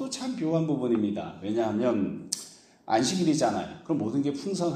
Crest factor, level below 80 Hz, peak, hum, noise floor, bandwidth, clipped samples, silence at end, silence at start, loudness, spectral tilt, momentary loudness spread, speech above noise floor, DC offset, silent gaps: 20 dB; -66 dBFS; -8 dBFS; none; -48 dBFS; 15 kHz; under 0.1%; 0 s; 0 s; -28 LUFS; -5 dB/octave; 9 LU; 21 dB; under 0.1%; none